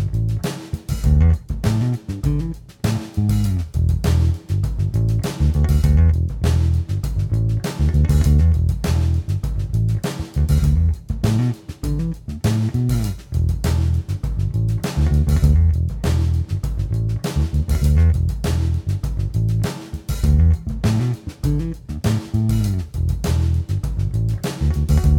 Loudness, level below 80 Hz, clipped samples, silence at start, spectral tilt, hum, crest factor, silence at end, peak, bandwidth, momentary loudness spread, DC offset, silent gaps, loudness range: -20 LUFS; -22 dBFS; under 0.1%; 0 s; -7 dB/octave; none; 14 dB; 0 s; -4 dBFS; 16 kHz; 8 LU; under 0.1%; none; 3 LU